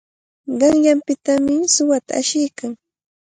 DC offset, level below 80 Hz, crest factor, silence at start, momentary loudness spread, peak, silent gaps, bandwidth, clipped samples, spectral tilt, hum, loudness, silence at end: under 0.1%; -58 dBFS; 16 dB; 0.45 s; 15 LU; -2 dBFS; none; 9.6 kHz; under 0.1%; -2.5 dB/octave; none; -17 LUFS; 0.6 s